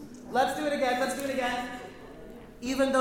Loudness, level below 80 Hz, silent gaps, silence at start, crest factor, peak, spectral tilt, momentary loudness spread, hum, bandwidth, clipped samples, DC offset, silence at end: -29 LUFS; -56 dBFS; none; 0 s; 18 dB; -12 dBFS; -3.5 dB/octave; 19 LU; none; 19 kHz; under 0.1%; under 0.1%; 0 s